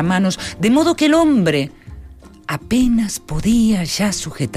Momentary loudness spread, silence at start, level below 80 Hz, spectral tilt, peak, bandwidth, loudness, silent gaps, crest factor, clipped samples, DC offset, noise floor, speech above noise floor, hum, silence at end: 10 LU; 0 s; -36 dBFS; -5 dB/octave; -6 dBFS; 15.5 kHz; -16 LUFS; none; 12 dB; under 0.1%; under 0.1%; -39 dBFS; 23 dB; none; 0 s